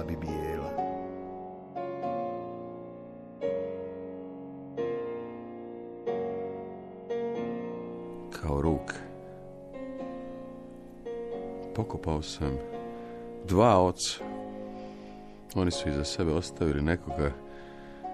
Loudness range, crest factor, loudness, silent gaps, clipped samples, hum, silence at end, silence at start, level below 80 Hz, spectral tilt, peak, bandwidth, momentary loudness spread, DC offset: 8 LU; 22 dB; -33 LUFS; none; under 0.1%; none; 0 s; 0 s; -46 dBFS; -5.5 dB/octave; -10 dBFS; 13 kHz; 15 LU; under 0.1%